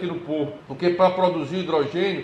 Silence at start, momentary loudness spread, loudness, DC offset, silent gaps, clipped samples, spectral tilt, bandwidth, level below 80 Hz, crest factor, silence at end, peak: 0 s; 9 LU; -23 LUFS; under 0.1%; none; under 0.1%; -7 dB/octave; 8.4 kHz; -64 dBFS; 18 dB; 0 s; -4 dBFS